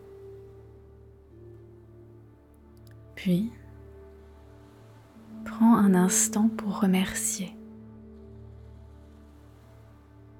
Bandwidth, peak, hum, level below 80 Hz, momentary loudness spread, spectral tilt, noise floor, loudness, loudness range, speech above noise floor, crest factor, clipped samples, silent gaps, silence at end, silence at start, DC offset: 18 kHz; -10 dBFS; none; -56 dBFS; 28 LU; -5 dB/octave; -54 dBFS; -25 LUFS; 11 LU; 30 dB; 20 dB; under 0.1%; none; 1.65 s; 0.05 s; under 0.1%